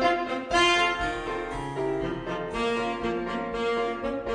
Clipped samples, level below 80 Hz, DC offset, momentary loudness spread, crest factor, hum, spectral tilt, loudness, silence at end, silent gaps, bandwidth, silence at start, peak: under 0.1%; -46 dBFS; under 0.1%; 10 LU; 18 dB; none; -4 dB/octave; -27 LUFS; 0 s; none; 10 kHz; 0 s; -10 dBFS